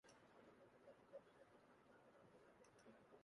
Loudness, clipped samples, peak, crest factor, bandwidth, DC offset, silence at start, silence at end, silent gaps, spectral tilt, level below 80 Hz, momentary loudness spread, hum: -68 LUFS; under 0.1%; -50 dBFS; 18 dB; 11 kHz; under 0.1%; 0.05 s; 0 s; none; -5 dB/octave; under -90 dBFS; 5 LU; none